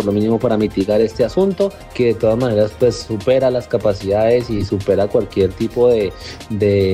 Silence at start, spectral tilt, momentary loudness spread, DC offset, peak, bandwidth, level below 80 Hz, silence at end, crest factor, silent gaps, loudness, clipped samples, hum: 0 s; -7 dB/octave; 5 LU; under 0.1%; -2 dBFS; 15.5 kHz; -40 dBFS; 0 s; 14 dB; none; -17 LUFS; under 0.1%; none